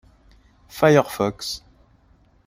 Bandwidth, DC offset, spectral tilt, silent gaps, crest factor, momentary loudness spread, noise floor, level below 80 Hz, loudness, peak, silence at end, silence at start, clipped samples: 16 kHz; under 0.1%; -5.5 dB/octave; none; 22 dB; 17 LU; -57 dBFS; -54 dBFS; -20 LUFS; -2 dBFS; 0.9 s; 0.75 s; under 0.1%